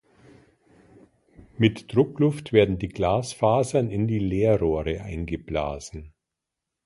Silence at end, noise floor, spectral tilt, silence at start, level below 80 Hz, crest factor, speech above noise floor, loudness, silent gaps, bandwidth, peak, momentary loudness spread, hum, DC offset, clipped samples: 0.8 s; -85 dBFS; -7 dB/octave; 1.6 s; -44 dBFS; 22 dB; 62 dB; -24 LUFS; none; 11.5 kHz; -4 dBFS; 11 LU; none; under 0.1%; under 0.1%